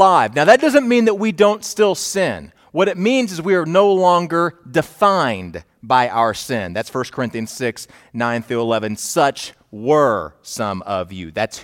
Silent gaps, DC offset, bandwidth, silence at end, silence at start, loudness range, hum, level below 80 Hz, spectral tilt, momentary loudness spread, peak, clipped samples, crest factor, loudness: none; under 0.1%; 17.5 kHz; 0 s; 0 s; 5 LU; none; -56 dBFS; -4.5 dB/octave; 13 LU; 0 dBFS; under 0.1%; 18 dB; -17 LUFS